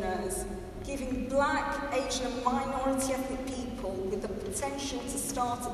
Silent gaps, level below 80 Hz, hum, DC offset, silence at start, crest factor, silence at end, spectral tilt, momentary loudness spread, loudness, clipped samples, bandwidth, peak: none; -46 dBFS; none; under 0.1%; 0 s; 20 dB; 0 s; -4 dB/octave; 7 LU; -32 LUFS; under 0.1%; 14.5 kHz; -12 dBFS